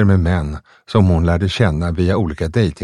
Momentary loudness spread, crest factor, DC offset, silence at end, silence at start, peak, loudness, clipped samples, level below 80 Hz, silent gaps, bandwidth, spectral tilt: 6 LU; 16 dB; under 0.1%; 0 s; 0 s; 0 dBFS; -17 LUFS; under 0.1%; -28 dBFS; none; 10.5 kHz; -7.5 dB/octave